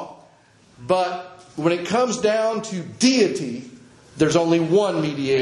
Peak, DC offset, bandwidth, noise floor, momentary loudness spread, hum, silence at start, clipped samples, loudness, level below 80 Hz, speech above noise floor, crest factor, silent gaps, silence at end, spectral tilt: -2 dBFS; under 0.1%; 11.5 kHz; -54 dBFS; 15 LU; none; 0 s; under 0.1%; -21 LUFS; -60 dBFS; 34 dB; 18 dB; none; 0 s; -5 dB/octave